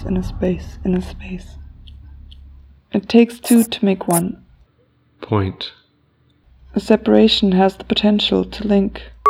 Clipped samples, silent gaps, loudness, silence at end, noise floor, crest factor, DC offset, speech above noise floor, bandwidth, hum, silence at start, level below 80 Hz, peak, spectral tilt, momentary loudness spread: under 0.1%; none; -17 LUFS; 0 s; -58 dBFS; 18 dB; under 0.1%; 42 dB; 16.5 kHz; none; 0 s; -38 dBFS; 0 dBFS; -5.5 dB/octave; 16 LU